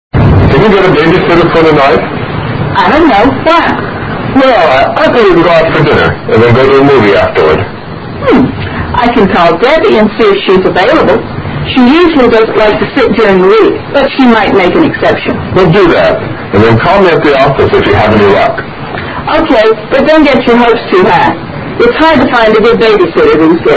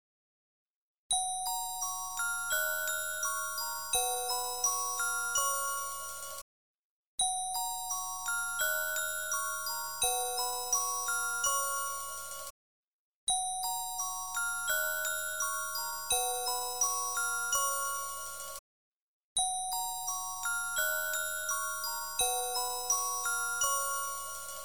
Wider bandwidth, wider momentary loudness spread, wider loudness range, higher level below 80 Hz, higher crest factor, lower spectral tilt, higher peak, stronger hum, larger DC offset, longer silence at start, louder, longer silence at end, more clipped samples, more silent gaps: second, 8 kHz vs over 20 kHz; about the same, 7 LU vs 7 LU; about the same, 1 LU vs 3 LU; first, -26 dBFS vs -64 dBFS; second, 6 dB vs 16 dB; first, -7.5 dB/octave vs 2.5 dB/octave; first, 0 dBFS vs -18 dBFS; neither; second, under 0.1% vs 0.2%; second, 0.15 s vs 0.65 s; first, -6 LUFS vs -32 LUFS; about the same, 0 s vs 0 s; first, 4% vs under 0.1%; second, none vs 0.66-1.10 s, 6.42-7.18 s, 12.50-13.27 s, 18.59-19.36 s